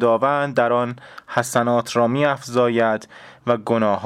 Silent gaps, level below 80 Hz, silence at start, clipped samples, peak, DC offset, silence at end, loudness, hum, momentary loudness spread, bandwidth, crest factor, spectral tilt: none; -68 dBFS; 0 s; under 0.1%; -4 dBFS; under 0.1%; 0 s; -20 LUFS; none; 8 LU; 15.5 kHz; 16 dB; -5.5 dB/octave